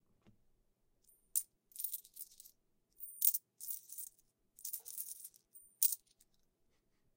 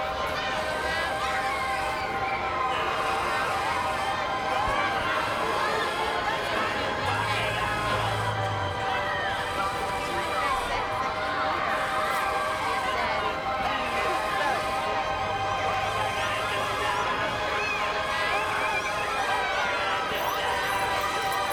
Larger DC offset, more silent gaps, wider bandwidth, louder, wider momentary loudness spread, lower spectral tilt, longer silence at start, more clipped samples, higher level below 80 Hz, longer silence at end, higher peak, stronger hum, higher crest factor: neither; neither; second, 17 kHz vs over 20 kHz; second, -38 LUFS vs -27 LUFS; first, 19 LU vs 2 LU; second, 2.5 dB/octave vs -3.5 dB/octave; first, 1.35 s vs 0 s; neither; second, -84 dBFS vs -48 dBFS; first, 1.2 s vs 0 s; about the same, -12 dBFS vs -12 dBFS; neither; first, 32 dB vs 16 dB